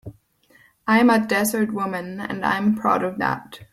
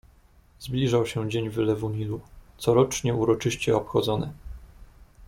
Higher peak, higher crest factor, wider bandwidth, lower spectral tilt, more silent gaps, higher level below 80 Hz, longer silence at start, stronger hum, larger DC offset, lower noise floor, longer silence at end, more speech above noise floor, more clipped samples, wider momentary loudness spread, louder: about the same, -6 dBFS vs -8 dBFS; about the same, 16 dB vs 18 dB; about the same, 16 kHz vs 16.5 kHz; about the same, -5 dB/octave vs -6 dB/octave; neither; second, -58 dBFS vs -48 dBFS; second, 0.05 s vs 0.6 s; neither; neither; about the same, -57 dBFS vs -56 dBFS; about the same, 0.1 s vs 0 s; first, 36 dB vs 32 dB; neither; about the same, 13 LU vs 14 LU; first, -21 LUFS vs -26 LUFS